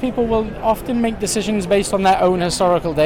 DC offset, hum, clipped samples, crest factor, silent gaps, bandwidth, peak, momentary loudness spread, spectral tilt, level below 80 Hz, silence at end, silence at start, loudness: 0.4%; none; under 0.1%; 12 dB; none; 17 kHz; -6 dBFS; 5 LU; -4.5 dB/octave; -36 dBFS; 0 s; 0 s; -18 LUFS